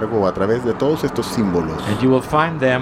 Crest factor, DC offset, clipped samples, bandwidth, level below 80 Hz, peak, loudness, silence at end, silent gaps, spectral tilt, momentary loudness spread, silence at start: 16 dB; under 0.1%; under 0.1%; 15.5 kHz; -42 dBFS; -2 dBFS; -18 LUFS; 0 s; none; -6.5 dB/octave; 4 LU; 0 s